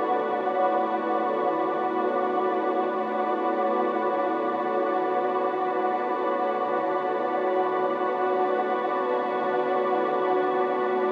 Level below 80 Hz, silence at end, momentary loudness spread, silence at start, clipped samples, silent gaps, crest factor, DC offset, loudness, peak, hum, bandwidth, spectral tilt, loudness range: -84 dBFS; 0 s; 2 LU; 0 s; under 0.1%; none; 14 dB; under 0.1%; -25 LUFS; -12 dBFS; none; 6 kHz; -7 dB/octave; 1 LU